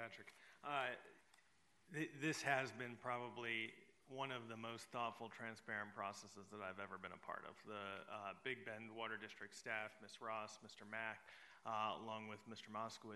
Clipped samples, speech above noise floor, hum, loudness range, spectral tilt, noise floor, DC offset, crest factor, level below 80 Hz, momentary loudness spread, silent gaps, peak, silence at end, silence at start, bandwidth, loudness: under 0.1%; 28 dB; none; 5 LU; -4 dB/octave; -77 dBFS; under 0.1%; 24 dB; under -90 dBFS; 11 LU; none; -24 dBFS; 0 s; 0 s; 12 kHz; -49 LUFS